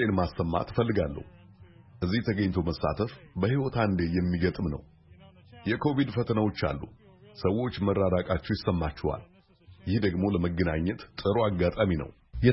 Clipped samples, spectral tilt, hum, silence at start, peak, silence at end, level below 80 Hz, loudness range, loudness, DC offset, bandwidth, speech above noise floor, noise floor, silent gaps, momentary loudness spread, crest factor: under 0.1%; -11 dB/octave; none; 0 s; -8 dBFS; 0 s; -46 dBFS; 2 LU; -29 LUFS; under 0.1%; 5.8 kHz; 28 dB; -55 dBFS; none; 7 LU; 20 dB